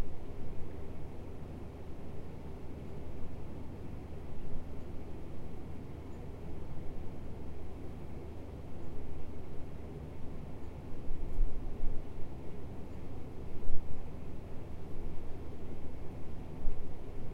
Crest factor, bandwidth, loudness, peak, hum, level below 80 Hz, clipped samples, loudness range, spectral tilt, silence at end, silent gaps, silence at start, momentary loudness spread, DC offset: 20 dB; 3.4 kHz; -47 LUFS; -12 dBFS; none; -42 dBFS; under 0.1%; 2 LU; -8 dB/octave; 0 s; none; 0 s; 3 LU; under 0.1%